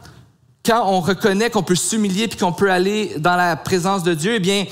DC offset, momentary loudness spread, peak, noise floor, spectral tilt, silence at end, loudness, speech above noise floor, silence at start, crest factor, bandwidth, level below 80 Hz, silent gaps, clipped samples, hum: 0.2%; 3 LU; -4 dBFS; -49 dBFS; -4.5 dB/octave; 0 s; -18 LUFS; 32 dB; 0.05 s; 14 dB; 16 kHz; -54 dBFS; none; under 0.1%; none